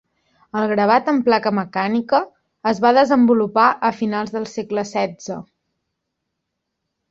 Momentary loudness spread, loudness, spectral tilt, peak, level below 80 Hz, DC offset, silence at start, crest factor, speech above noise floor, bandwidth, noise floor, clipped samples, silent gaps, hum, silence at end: 12 LU; -18 LUFS; -6 dB/octave; -2 dBFS; -62 dBFS; under 0.1%; 0.55 s; 18 dB; 60 dB; 7.6 kHz; -78 dBFS; under 0.1%; none; none; 1.7 s